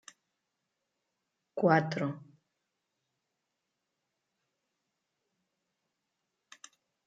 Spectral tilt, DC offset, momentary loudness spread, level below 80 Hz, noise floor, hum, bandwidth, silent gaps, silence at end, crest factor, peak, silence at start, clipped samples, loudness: -7 dB/octave; under 0.1%; 18 LU; -86 dBFS; -85 dBFS; none; 9.2 kHz; none; 4.85 s; 26 dB; -12 dBFS; 1.55 s; under 0.1%; -30 LUFS